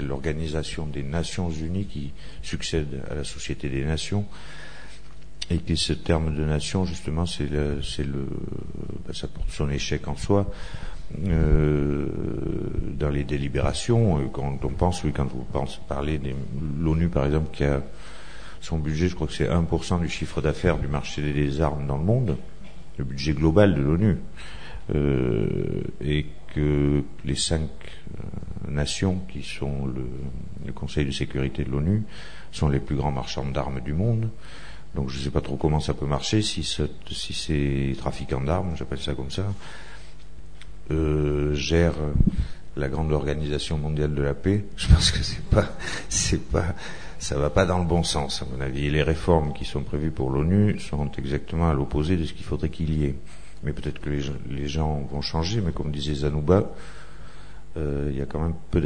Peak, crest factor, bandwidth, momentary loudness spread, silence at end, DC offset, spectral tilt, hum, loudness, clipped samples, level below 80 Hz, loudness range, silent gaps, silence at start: -2 dBFS; 24 dB; 10 kHz; 14 LU; 0 s; 2%; -6 dB/octave; none; -26 LUFS; under 0.1%; -34 dBFS; 5 LU; none; 0 s